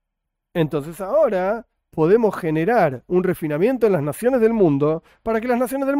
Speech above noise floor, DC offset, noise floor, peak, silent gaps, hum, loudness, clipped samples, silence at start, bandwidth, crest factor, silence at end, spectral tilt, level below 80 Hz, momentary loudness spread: 60 dB; under 0.1%; -79 dBFS; -4 dBFS; none; none; -20 LUFS; under 0.1%; 0.55 s; 16 kHz; 16 dB; 0 s; -7.5 dB/octave; -52 dBFS; 8 LU